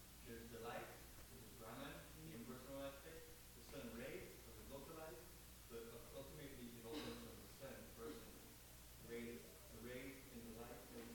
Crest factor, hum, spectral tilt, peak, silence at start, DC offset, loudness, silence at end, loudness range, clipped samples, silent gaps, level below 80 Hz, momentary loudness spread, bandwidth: 16 dB; 60 Hz at -70 dBFS; -4 dB/octave; -40 dBFS; 0 s; under 0.1%; -56 LUFS; 0 s; 1 LU; under 0.1%; none; -68 dBFS; 7 LU; 18 kHz